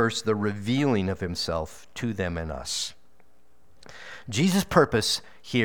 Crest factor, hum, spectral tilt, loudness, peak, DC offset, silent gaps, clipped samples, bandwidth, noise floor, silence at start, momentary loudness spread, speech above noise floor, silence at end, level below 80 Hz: 22 dB; none; -4.5 dB/octave; -26 LUFS; -4 dBFS; 0.5%; none; under 0.1%; over 20 kHz; -64 dBFS; 0 s; 13 LU; 38 dB; 0 s; -50 dBFS